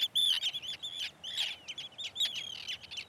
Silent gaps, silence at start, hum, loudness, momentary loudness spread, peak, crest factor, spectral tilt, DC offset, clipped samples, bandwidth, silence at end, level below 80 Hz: none; 0 s; none; -33 LUFS; 13 LU; -20 dBFS; 16 dB; 1.5 dB/octave; under 0.1%; under 0.1%; 17.5 kHz; 0 s; -74 dBFS